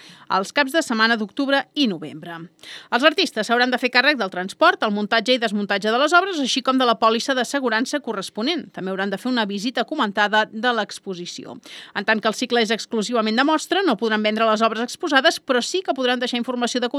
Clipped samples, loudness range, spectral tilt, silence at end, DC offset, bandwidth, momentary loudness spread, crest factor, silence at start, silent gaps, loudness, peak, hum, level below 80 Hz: under 0.1%; 4 LU; -3 dB/octave; 0 s; under 0.1%; 15 kHz; 11 LU; 20 dB; 0.05 s; none; -20 LUFS; 0 dBFS; none; -78 dBFS